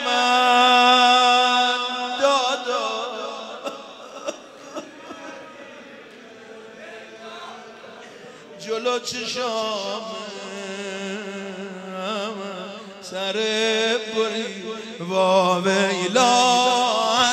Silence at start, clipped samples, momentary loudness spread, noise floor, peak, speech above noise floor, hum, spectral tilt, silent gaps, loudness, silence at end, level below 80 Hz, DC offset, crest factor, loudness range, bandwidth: 0 s; under 0.1%; 24 LU; -43 dBFS; -4 dBFS; 21 dB; none; -2.5 dB/octave; none; -20 LUFS; 0 s; -72 dBFS; under 0.1%; 20 dB; 20 LU; 13.5 kHz